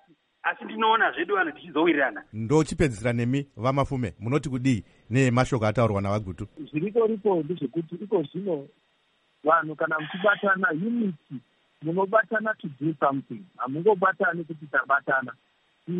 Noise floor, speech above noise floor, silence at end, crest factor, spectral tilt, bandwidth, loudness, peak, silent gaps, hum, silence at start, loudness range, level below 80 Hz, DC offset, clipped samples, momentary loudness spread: -68 dBFS; 43 dB; 0 s; 18 dB; -6.5 dB/octave; 11 kHz; -25 LUFS; -6 dBFS; none; none; 0.45 s; 3 LU; -52 dBFS; under 0.1%; under 0.1%; 10 LU